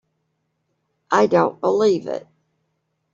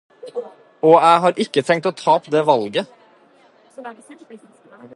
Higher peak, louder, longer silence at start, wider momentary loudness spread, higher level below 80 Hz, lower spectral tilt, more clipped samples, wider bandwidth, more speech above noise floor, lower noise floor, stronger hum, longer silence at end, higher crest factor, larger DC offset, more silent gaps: about the same, -2 dBFS vs 0 dBFS; about the same, -18 LUFS vs -16 LUFS; first, 1.1 s vs 0.25 s; second, 12 LU vs 24 LU; first, -66 dBFS vs -72 dBFS; about the same, -6 dB/octave vs -5.5 dB/octave; neither; second, 7.6 kHz vs 11.5 kHz; first, 55 dB vs 35 dB; first, -72 dBFS vs -52 dBFS; neither; first, 0.95 s vs 0.1 s; about the same, 20 dB vs 18 dB; neither; neither